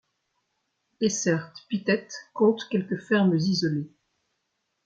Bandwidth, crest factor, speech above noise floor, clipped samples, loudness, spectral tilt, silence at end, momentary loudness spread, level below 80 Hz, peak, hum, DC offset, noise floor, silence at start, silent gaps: 8 kHz; 18 dB; 53 dB; under 0.1%; -26 LUFS; -5 dB/octave; 1 s; 10 LU; -70 dBFS; -10 dBFS; none; under 0.1%; -78 dBFS; 1 s; none